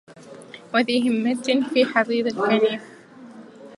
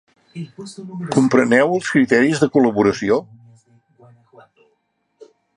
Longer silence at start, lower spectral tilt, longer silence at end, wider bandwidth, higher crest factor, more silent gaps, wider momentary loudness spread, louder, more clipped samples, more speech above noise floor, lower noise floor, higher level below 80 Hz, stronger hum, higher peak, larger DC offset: second, 0.1 s vs 0.35 s; second, -4.5 dB/octave vs -6 dB/octave; second, 0 s vs 0.3 s; about the same, 11.5 kHz vs 11 kHz; about the same, 20 dB vs 18 dB; neither; second, 9 LU vs 20 LU; second, -21 LUFS vs -16 LUFS; neither; second, 23 dB vs 51 dB; second, -43 dBFS vs -68 dBFS; second, -74 dBFS vs -58 dBFS; neither; second, -4 dBFS vs 0 dBFS; neither